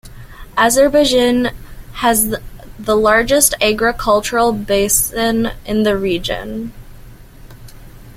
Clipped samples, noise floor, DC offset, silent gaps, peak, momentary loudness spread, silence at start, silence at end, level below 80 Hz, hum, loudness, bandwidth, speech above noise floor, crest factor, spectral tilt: under 0.1%; -37 dBFS; under 0.1%; none; 0 dBFS; 12 LU; 0.05 s; 0.05 s; -34 dBFS; none; -14 LUFS; 16.5 kHz; 23 dB; 16 dB; -3 dB/octave